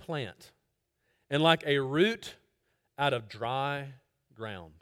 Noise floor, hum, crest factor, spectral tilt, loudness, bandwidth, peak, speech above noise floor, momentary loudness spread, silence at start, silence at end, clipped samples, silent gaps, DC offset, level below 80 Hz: -79 dBFS; none; 24 dB; -5.5 dB/octave; -29 LUFS; 16 kHz; -8 dBFS; 49 dB; 17 LU; 0 s; 0.1 s; under 0.1%; none; under 0.1%; -70 dBFS